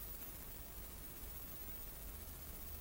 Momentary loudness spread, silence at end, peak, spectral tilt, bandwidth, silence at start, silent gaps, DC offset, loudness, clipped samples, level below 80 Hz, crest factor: 3 LU; 0 s; -32 dBFS; -3.5 dB/octave; 16 kHz; 0 s; none; under 0.1%; -49 LUFS; under 0.1%; -54 dBFS; 18 dB